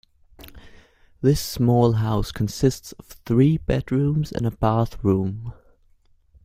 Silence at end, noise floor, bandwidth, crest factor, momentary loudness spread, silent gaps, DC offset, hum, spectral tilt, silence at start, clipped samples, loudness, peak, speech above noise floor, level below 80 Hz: 0.95 s; -58 dBFS; 16 kHz; 18 dB; 14 LU; none; under 0.1%; none; -7 dB/octave; 0.4 s; under 0.1%; -22 LUFS; -4 dBFS; 37 dB; -40 dBFS